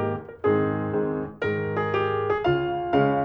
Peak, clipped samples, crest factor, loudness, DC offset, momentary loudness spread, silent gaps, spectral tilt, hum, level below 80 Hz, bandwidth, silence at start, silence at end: -8 dBFS; under 0.1%; 16 dB; -25 LUFS; under 0.1%; 5 LU; none; -9 dB/octave; none; -52 dBFS; 5.8 kHz; 0 s; 0 s